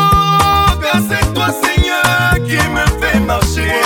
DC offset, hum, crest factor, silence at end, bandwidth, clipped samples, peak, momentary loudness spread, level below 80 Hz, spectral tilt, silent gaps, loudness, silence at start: under 0.1%; none; 12 dB; 0 s; 19.5 kHz; under 0.1%; 0 dBFS; 4 LU; -22 dBFS; -4.5 dB/octave; none; -12 LUFS; 0 s